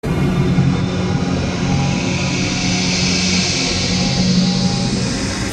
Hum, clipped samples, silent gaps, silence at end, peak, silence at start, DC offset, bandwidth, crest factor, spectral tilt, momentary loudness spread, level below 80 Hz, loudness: none; under 0.1%; none; 0 s; -4 dBFS; 0.05 s; under 0.1%; 10 kHz; 14 dB; -4.5 dB/octave; 4 LU; -32 dBFS; -16 LUFS